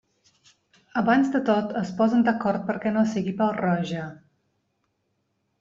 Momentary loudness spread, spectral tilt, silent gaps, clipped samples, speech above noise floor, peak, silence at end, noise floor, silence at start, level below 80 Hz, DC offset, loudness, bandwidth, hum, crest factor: 10 LU; -7 dB/octave; none; under 0.1%; 51 dB; -8 dBFS; 1.45 s; -74 dBFS; 0.95 s; -64 dBFS; under 0.1%; -24 LUFS; 7.6 kHz; none; 18 dB